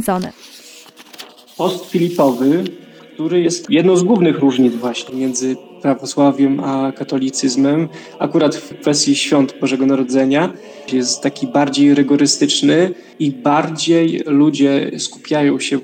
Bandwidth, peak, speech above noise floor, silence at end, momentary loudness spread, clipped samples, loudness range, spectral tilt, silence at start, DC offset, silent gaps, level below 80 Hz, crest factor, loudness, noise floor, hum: 16 kHz; -2 dBFS; 25 dB; 0 s; 9 LU; under 0.1%; 3 LU; -4.5 dB/octave; 0 s; under 0.1%; none; -62 dBFS; 12 dB; -15 LUFS; -40 dBFS; none